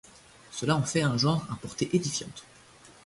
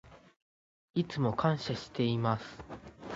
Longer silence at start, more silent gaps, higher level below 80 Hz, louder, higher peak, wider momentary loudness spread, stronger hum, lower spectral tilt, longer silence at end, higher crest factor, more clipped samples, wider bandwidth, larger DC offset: first, 0.5 s vs 0.05 s; second, none vs 0.42-0.94 s; about the same, -60 dBFS vs -62 dBFS; first, -28 LUFS vs -33 LUFS; about the same, -10 dBFS vs -12 dBFS; about the same, 15 LU vs 17 LU; neither; second, -5 dB/octave vs -7 dB/octave; first, 0.15 s vs 0 s; about the same, 20 dB vs 22 dB; neither; first, 11.5 kHz vs 7.8 kHz; neither